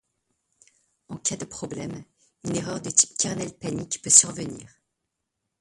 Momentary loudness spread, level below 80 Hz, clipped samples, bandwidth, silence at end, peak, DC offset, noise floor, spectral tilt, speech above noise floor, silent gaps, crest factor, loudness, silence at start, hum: 22 LU; -62 dBFS; under 0.1%; 15 kHz; 0.95 s; 0 dBFS; under 0.1%; -81 dBFS; -2.5 dB/octave; 56 dB; none; 28 dB; -22 LUFS; 1.1 s; none